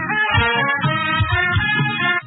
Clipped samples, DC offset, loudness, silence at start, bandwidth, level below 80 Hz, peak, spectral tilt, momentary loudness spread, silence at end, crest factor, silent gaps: under 0.1%; under 0.1%; -17 LUFS; 0 s; 4.1 kHz; -36 dBFS; -2 dBFS; -10.5 dB/octave; 2 LU; 0 s; 16 dB; none